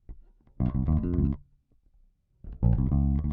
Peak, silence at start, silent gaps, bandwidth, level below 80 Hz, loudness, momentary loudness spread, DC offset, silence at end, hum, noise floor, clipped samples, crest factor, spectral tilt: -10 dBFS; 0.1 s; none; 2.8 kHz; -32 dBFS; -28 LUFS; 8 LU; under 0.1%; 0 s; none; -64 dBFS; under 0.1%; 18 dB; -13 dB/octave